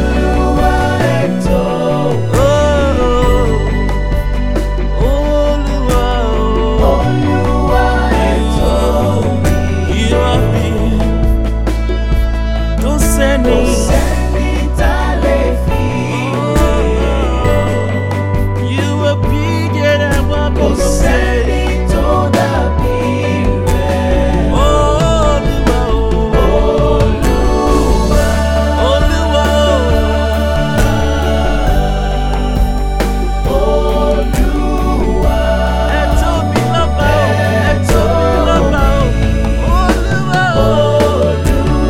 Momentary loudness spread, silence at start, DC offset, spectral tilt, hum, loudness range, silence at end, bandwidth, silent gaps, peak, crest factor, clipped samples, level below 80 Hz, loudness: 4 LU; 0 s; under 0.1%; -6 dB/octave; none; 2 LU; 0 s; 15.5 kHz; none; 0 dBFS; 12 dB; under 0.1%; -16 dBFS; -13 LUFS